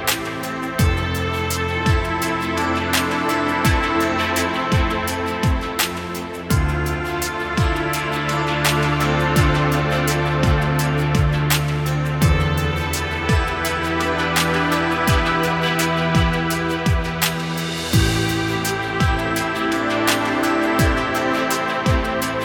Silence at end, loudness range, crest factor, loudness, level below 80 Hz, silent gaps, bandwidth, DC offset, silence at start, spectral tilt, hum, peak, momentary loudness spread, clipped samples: 0 s; 2 LU; 16 dB; -19 LUFS; -30 dBFS; none; 19 kHz; under 0.1%; 0 s; -5 dB/octave; none; -4 dBFS; 4 LU; under 0.1%